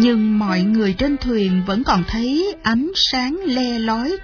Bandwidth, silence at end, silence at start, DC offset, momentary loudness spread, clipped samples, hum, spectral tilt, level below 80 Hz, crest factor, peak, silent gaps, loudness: 5.4 kHz; 0 s; 0 s; under 0.1%; 4 LU; under 0.1%; none; -5.5 dB/octave; -36 dBFS; 14 dB; -4 dBFS; none; -18 LUFS